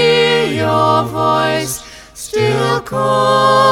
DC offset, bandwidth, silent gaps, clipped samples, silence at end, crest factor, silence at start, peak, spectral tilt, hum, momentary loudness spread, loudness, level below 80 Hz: under 0.1%; 17.5 kHz; none; under 0.1%; 0 s; 14 dB; 0 s; 0 dBFS; -4.5 dB/octave; none; 11 LU; -14 LUFS; -46 dBFS